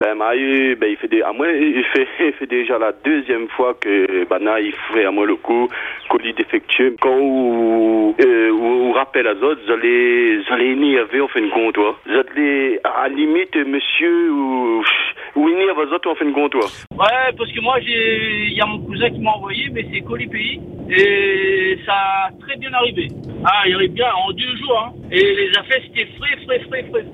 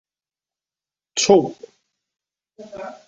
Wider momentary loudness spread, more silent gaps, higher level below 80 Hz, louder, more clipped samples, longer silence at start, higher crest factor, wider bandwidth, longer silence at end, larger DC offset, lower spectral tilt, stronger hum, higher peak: second, 7 LU vs 20 LU; neither; first, -52 dBFS vs -64 dBFS; about the same, -17 LUFS vs -18 LUFS; neither; second, 0 s vs 1.15 s; second, 16 dB vs 22 dB; about the same, 7.6 kHz vs 8.2 kHz; second, 0 s vs 0.15 s; neither; first, -6 dB/octave vs -3.5 dB/octave; neither; about the same, 0 dBFS vs -2 dBFS